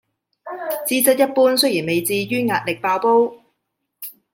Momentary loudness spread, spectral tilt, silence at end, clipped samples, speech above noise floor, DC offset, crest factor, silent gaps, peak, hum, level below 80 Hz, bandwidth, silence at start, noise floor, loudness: 18 LU; -3.5 dB/octave; 0.2 s; under 0.1%; 58 dB; under 0.1%; 18 dB; none; -2 dBFS; none; -70 dBFS; 16.5 kHz; 0.45 s; -75 dBFS; -18 LUFS